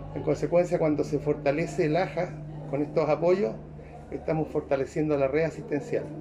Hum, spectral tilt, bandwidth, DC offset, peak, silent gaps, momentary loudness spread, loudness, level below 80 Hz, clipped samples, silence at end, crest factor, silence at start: none; -7.5 dB/octave; 11 kHz; under 0.1%; -10 dBFS; none; 10 LU; -27 LUFS; -50 dBFS; under 0.1%; 0 s; 16 dB; 0 s